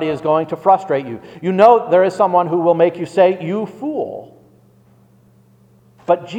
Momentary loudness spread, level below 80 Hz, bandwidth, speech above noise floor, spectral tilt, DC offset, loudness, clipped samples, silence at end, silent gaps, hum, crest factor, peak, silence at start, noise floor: 13 LU; -64 dBFS; 9.6 kHz; 35 dB; -7.5 dB/octave; under 0.1%; -15 LUFS; under 0.1%; 0 s; none; none; 16 dB; 0 dBFS; 0 s; -51 dBFS